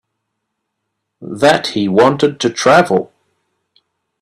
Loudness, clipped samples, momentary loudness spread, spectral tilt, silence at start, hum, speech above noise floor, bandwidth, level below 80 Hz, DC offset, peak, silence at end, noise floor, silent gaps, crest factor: -13 LUFS; under 0.1%; 8 LU; -4.5 dB/octave; 1.2 s; none; 62 dB; 13.5 kHz; -56 dBFS; under 0.1%; 0 dBFS; 1.15 s; -74 dBFS; none; 16 dB